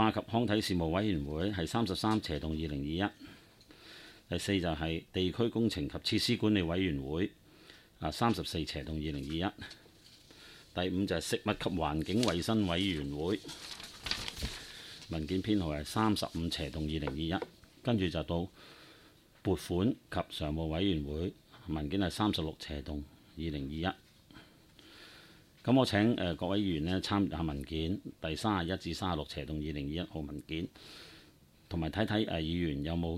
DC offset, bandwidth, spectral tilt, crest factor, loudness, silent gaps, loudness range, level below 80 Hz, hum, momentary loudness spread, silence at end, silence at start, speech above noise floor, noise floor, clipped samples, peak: under 0.1%; 16 kHz; -5.5 dB/octave; 20 dB; -34 LUFS; none; 5 LU; -50 dBFS; none; 14 LU; 0 s; 0 s; 28 dB; -61 dBFS; under 0.1%; -14 dBFS